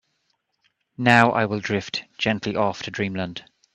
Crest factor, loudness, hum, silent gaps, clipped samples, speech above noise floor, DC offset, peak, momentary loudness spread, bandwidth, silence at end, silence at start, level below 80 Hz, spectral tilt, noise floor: 24 dB; -22 LUFS; none; none; under 0.1%; 50 dB; under 0.1%; 0 dBFS; 14 LU; 10.5 kHz; 0.35 s; 1 s; -60 dBFS; -5.5 dB/octave; -72 dBFS